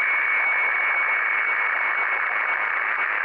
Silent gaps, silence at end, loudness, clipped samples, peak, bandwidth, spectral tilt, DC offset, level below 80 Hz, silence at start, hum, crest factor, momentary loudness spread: none; 0 s; -20 LUFS; under 0.1%; -14 dBFS; 5.4 kHz; -3 dB/octave; under 0.1%; -72 dBFS; 0 s; none; 10 dB; 3 LU